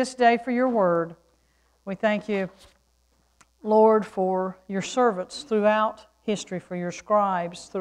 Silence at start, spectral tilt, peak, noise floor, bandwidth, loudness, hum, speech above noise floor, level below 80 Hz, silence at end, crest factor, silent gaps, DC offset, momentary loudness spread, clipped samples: 0 s; -5.5 dB/octave; -8 dBFS; -66 dBFS; 11 kHz; -24 LUFS; none; 42 dB; -66 dBFS; 0 s; 18 dB; none; under 0.1%; 13 LU; under 0.1%